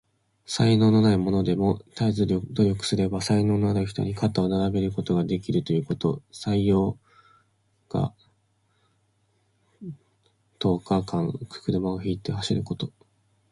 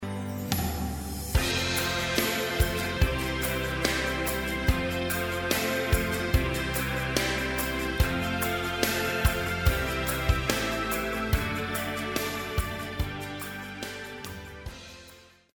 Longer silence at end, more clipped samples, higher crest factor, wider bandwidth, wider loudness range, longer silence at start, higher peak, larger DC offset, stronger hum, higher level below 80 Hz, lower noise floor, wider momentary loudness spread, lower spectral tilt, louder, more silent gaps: first, 0.6 s vs 0.3 s; neither; second, 16 dB vs 22 dB; second, 11.5 kHz vs over 20 kHz; first, 10 LU vs 5 LU; first, 0.5 s vs 0 s; about the same, -8 dBFS vs -8 dBFS; neither; neither; second, -48 dBFS vs -36 dBFS; first, -68 dBFS vs -53 dBFS; about the same, 11 LU vs 10 LU; first, -7 dB/octave vs -4 dB/octave; first, -25 LUFS vs -28 LUFS; neither